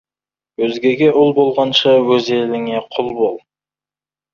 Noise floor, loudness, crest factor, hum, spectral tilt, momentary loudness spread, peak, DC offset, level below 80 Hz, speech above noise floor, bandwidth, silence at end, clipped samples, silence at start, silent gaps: under -90 dBFS; -15 LUFS; 14 dB; none; -5.5 dB/octave; 9 LU; -2 dBFS; under 0.1%; -60 dBFS; over 76 dB; 7 kHz; 0.95 s; under 0.1%; 0.6 s; none